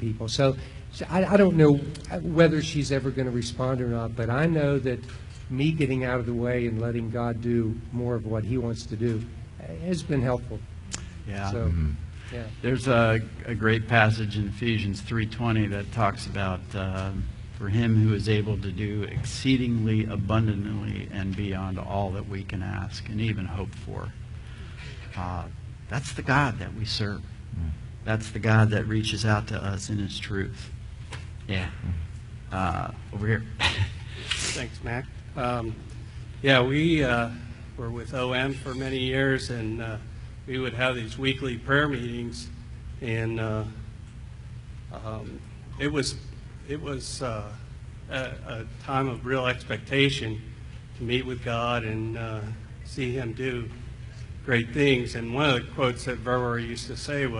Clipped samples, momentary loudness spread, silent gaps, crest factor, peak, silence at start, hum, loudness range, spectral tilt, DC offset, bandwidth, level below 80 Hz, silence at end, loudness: under 0.1%; 17 LU; none; 24 dB; -4 dBFS; 0 s; none; 8 LU; -6 dB/octave; under 0.1%; 11 kHz; -42 dBFS; 0 s; -27 LUFS